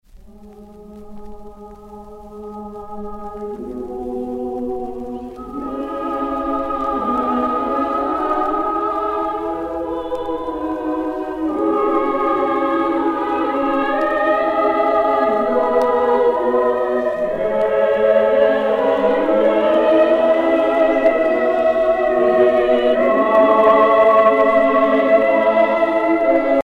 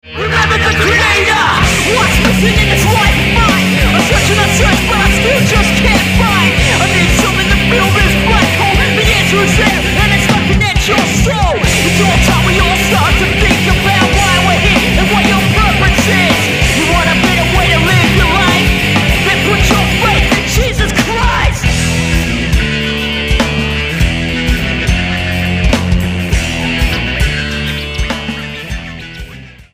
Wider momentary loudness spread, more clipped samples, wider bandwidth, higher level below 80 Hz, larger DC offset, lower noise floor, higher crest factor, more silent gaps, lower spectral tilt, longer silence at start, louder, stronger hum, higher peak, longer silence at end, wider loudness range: first, 14 LU vs 5 LU; neither; second, 6.4 kHz vs 15.5 kHz; second, -46 dBFS vs -18 dBFS; neither; first, -41 dBFS vs -31 dBFS; about the same, 14 dB vs 10 dB; neither; first, -6.5 dB/octave vs -4 dB/octave; about the same, 0.15 s vs 0.05 s; second, -17 LUFS vs -10 LUFS; neither; about the same, -2 dBFS vs 0 dBFS; about the same, 0 s vs 0.1 s; first, 14 LU vs 4 LU